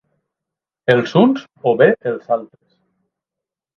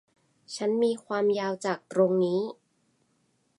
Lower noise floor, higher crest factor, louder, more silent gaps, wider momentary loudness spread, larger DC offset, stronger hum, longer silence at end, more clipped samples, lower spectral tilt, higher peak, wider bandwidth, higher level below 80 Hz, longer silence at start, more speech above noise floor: first, -86 dBFS vs -71 dBFS; about the same, 18 dB vs 18 dB; first, -16 LUFS vs -27 LUFS; neither; about the same, 9 LU vs 8 LU; neither; neither; first, 1.3 s vs 1.05 s; neither; first, -7.5 dB/octave vs -6 dB/octave; first, 0 dBFS vs -10 dBFS; second, 7 kHz vs 11.5 kHz; first, -62 dBFS vs -80 dBFS; first, 0.9 s vs 0.5 s; first, 70 dB vs 44 dB